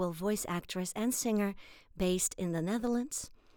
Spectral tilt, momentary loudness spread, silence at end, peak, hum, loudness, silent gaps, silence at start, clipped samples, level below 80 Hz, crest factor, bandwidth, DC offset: -4.5 dB/octave; 8 LU; 0.25 s; -20 dBFS; none; -34 LUFS; none; 0 s; under 0.1%; -56 dBFS; 16 dB; over 20 kHz; under 0.1%